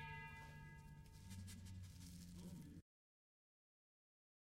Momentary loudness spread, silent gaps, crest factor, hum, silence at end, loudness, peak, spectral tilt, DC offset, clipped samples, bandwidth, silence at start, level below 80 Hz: 6 LU; none; 16 dB; none; 1.6 s; -58 LUFS; -42 dBFS; -5 dB/octave; under 0.1%; under 0.1%; 16 kHz; 0 s; -68 dBFS